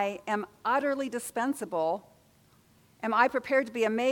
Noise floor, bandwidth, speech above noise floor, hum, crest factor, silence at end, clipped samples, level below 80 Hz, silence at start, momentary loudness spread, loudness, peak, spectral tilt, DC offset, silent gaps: -62 dBFS; 19 kHz; 34 dB; none; 20 dB; 0 s; under 0.1%; -74 dBFS; 0 s; 8 LU; -29 LUFS; -10 dBFS; -4 dB/octave; under 0.1%; none